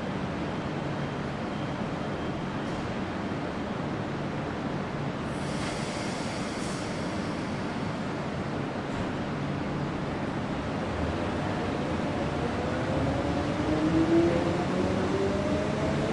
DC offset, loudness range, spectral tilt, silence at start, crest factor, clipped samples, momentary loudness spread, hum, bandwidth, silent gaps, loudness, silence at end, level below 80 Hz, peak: under 0.1%; 5 LU; -6.5 dB/octave; 0 s; 16 dB; under 0.1%; 5 LU; none; 11.5 kHz; none; -30 LUFS; 0 s; -48 dBFS; -12 dBFS